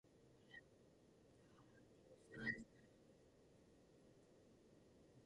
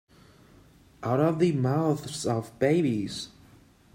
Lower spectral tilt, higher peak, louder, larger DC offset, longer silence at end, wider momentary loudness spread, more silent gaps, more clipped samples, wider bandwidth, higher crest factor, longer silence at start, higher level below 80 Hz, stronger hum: second, -5 dB/octave vs -6.5 dB/octave; second, -34 dBFS vs -10 dBFS; second, -52 LUFS vs -27 LUFS; neither; second, 0 s vs 0.7 s; first, 21 LU vs 12 LU; neither; neither; second, 11 kHz vs 16 kHz; first, 26 dB vs 18 dB; second, 0.05 s vs 1 s; second, -80 dBFS vs -62 dBFS; neither